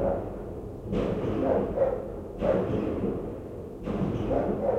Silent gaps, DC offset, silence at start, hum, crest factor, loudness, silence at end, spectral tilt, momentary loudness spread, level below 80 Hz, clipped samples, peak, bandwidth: none; under 0.1%; 0 s; none; 16 dB; -30 LUFS; 0 s; -9 dB/octave; 11 LU; -44 dBFS; under 0.1%; -14 dBFS; 10.5 kHz